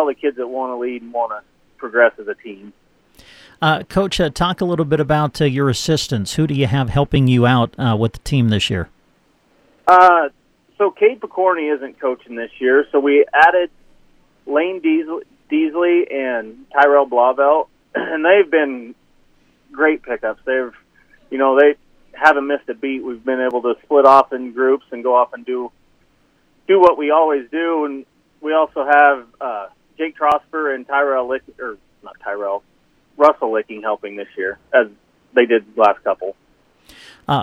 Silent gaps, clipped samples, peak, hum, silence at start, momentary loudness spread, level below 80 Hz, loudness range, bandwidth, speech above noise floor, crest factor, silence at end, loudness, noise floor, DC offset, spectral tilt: none; under 0.1%; 0 dBFS; none; 0 s; 14 LU; -46 dBFS; 5 LU; 14 kHz; 42 dB; 18 dB; 0 s; -17 LUFS; -58 dBFS; under 0.1%; -6 dB/octave